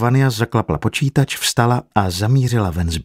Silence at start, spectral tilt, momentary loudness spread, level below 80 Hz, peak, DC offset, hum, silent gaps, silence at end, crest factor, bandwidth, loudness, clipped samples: 0 s; -5.5 dB/octave; 4 LU; -36 dBFS; 0 dBFS; under 0.1%; none; none; 0 s; 16 dB; 16 kHz; -17 LUFS; under 0.1%